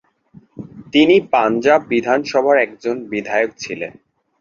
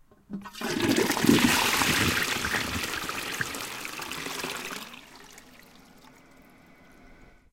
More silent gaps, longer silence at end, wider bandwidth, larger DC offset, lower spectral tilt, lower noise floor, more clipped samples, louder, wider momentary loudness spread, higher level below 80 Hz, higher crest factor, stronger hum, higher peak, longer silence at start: neither; about the same, 0.5 s vs 0.4 s; second, 7.4 kHz vs 17 kHz; neither; first, -5 dB/octave vs -3 dB/octave; second, -48 dBFS vs -55 dBFS; neither; first, -16 LUFS vs -26 LUFS; second, 17 LU vs 20 LU; second, -60 dBFS vs -52 dBFS; second, 16 dB vs 24 dB; neither; first, -2 dBFS vs -6 dBFS; first, 0.55 s vs 0.3 s